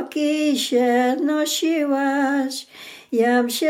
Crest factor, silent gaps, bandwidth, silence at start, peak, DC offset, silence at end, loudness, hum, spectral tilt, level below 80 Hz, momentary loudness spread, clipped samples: 12 dB; none; 16.5 kHz; 0 s; -8 dBFS; under 0.1%; 0 s; -20 LUFS; none; -2.5 dB/octave; -84 dBFS; 9 LU; under 0.1%